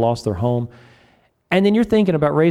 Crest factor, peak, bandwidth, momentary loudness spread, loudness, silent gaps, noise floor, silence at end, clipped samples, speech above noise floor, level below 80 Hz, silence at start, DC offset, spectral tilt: 14 dB; -4 dBFS; 12 kHz; 7 LU; -18 LUFS; none; -56 dBFS; 0 s; under 0.1%; 40 dB; -48 dBFS; 0 s; under 0.1%; -7.5 dB/octave